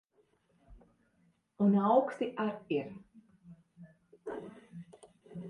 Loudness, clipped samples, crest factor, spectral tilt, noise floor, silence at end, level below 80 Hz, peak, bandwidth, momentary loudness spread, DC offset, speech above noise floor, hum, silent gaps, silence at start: -32 LUFS; under 0.1%; 22 dB; -8.5 dB/octave; -72 dBFS; 0 s; -70 dBFS; -14 dBFS; 9.4 kHz; 24 LU; under 0.1%; 42 dB; none; none; 0.7 s